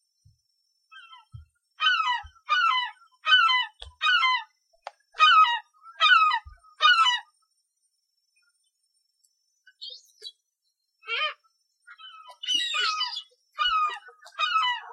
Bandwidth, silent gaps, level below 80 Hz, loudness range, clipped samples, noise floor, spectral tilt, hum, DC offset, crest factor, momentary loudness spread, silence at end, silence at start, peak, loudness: 11 kHz; none; -64 dBFS; 15 LU; under 0.1%; -78 dBFS; 1.5 dB/octave; none; under 0.1%; 22 dB; 23 LU; 0 s; 0.95 s; -6 dBFS; -23 LUFS